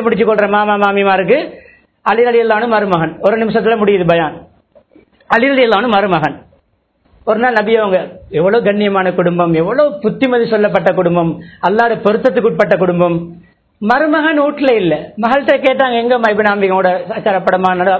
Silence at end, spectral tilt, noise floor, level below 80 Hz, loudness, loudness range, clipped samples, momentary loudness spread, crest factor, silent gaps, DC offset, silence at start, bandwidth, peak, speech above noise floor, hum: 0 s; -8 dB/octave; -58 dBFS; -50 dBFS; -12 LUFS; 2 LU; 0.1%; 5 LU; 12 dB; none; under 0.1%; 0 s; 8 kHz; 0 dBFS; 46 dB; none